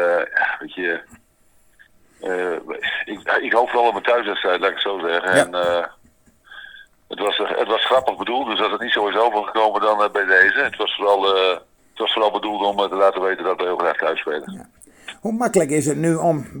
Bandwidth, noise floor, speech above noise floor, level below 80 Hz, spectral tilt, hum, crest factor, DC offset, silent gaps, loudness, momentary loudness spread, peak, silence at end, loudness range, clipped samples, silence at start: 19 kHz; -56 dBFS; 37 dB; -60 dBFS; -3.5 dB/octave; none; 18 dB; under 0.1%; none; -19 LUFS; 10 LU; -2 dBFS; 0 s; 5 LU; under 0.1%; 0 s